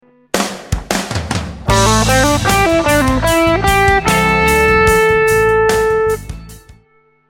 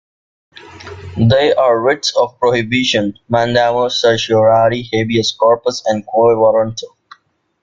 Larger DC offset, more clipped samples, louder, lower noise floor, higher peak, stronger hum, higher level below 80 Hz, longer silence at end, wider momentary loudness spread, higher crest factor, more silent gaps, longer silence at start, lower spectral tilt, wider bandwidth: neither; neither; about the same, -12 LUFS vs -13 LUFS; first, -53 dBFS vs -47 dBFS; about the same, 0 dBFS vs 0 dBFS; neither; first, -26 dBFS vs -48 dBFS; about the same, 0.7 s vs 0.75 s; first, 10 LU vs 7 LU; about the same, 14 dB vs 14 dB; neither; second, 0.35 s vs 0.7 s; about the same, -4 dB/octave vs -5 dB/octave; first, 17 kHz vs 7.6 kHz